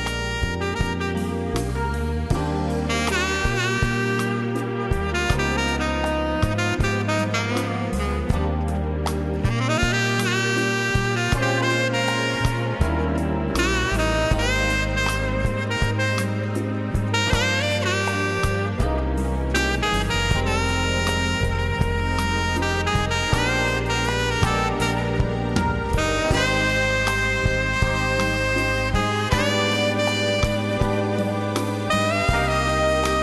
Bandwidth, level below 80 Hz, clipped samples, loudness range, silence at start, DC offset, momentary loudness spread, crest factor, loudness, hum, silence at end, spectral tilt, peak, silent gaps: 13 kHz; -30 dBFS; under 0.1%; 2 LU; 0 s; under 0.1%; 5 LU; 16 dB; -22 LUFS; none; 0 s; -5 dB/octave; -6 dBFS; none